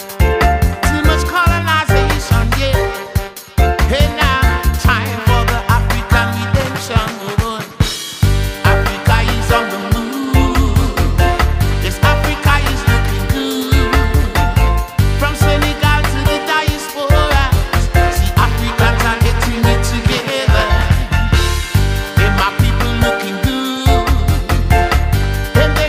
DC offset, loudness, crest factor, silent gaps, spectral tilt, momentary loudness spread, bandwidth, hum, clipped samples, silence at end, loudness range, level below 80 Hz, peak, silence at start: under 0.1%; -14 LUFS; 12 dB; none; -5 dB/octave; 4 LU; 16 kHz; none; under 0.1%; 0 s; 2 LU; -18 dBFS; 0 dBFS; 0 s